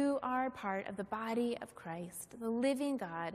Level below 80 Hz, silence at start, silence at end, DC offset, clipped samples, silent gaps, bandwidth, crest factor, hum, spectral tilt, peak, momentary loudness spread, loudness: -74 dBFS; 0 s; 0 s; under 0.1%; under 0.1%; none; 15 kHz; 14 dB; none; -5 dB/octave; -22 dBFS; 10 LU; -38 LUFS